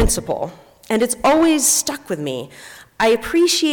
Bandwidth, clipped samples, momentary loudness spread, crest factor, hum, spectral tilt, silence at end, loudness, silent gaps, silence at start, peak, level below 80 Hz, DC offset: 19 kHz; under 0.1%; 15 LU; 12 dB; none; -3 dB/octave; 0 s; -17 LUFS; none; 0 s; -6 dBFS; -32 dBFS; under 0.1%